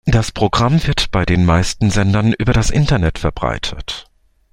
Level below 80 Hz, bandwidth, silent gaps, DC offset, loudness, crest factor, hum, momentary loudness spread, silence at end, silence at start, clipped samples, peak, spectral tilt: -26 dBFS; 16 kHz; none; under 0.1%; -16 LUFS; 14 dB; none; 9 LU; 0.5 s; 0.05 s; under 0.1%; -2 dBFS; -5.5 dB/octave